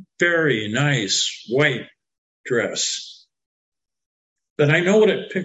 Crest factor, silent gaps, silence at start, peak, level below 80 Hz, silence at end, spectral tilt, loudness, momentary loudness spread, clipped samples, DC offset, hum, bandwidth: 18 dB; 2.18-2.44 s, 3.46-3.72 s, 4.06-4.36 s, 4.50-4.56 s; 0.2 s; -4 dBFS; -64 dBFS; 0 s; -4 dB/octave; -19 LUFS; 13 LU; under 0.1%; under 0.1%; none; 9 kHz